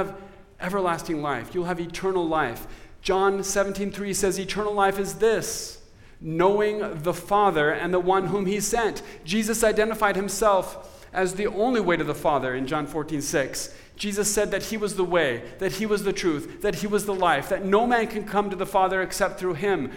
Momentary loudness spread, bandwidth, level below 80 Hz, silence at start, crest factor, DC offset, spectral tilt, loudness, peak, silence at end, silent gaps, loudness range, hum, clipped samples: 8 LU; 17 kHz; -46 dBFS; 0 s; 18 dB; under 0.1%; -4 dB/octave; -25 LUFS; -6 dBFS; 0 s; none; 3 LU; none; under 0.1%